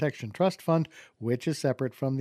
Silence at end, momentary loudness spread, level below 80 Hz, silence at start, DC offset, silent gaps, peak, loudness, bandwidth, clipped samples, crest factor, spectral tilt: 0 s; 6 LU; -72 dBFS; 0 s; under 0.1%; none; -12 dBFS; -29 LUFS; 15 kHz; under 0.1%; 18 dB; -7 dB/octave